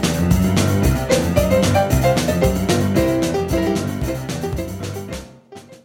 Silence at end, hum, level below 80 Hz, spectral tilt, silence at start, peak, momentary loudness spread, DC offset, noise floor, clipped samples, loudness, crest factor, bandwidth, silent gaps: 0.1 s; none; -28 dBFS; -5.5 dB/octave; 0 s; -2 dBFS; 11 LU; under 0.1%; -41 dBFS; under 0.1%; -18 LUFS; 16 dB; 17 kHz; none